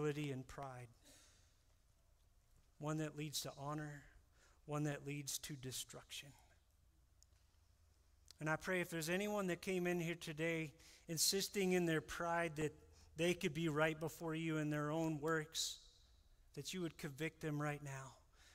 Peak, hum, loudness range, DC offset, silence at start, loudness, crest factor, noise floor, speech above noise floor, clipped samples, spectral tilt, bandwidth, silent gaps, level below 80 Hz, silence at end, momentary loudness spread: -24 dBFS; none; 9 LU; under 0.1%; 0 s; -43 LUFS; 22 dB; -73 dBFS; 31 dB; under 0.1%; -4 dB/octave; 16 kHz; none; -70 dBFS; 0.05 s; 14 LU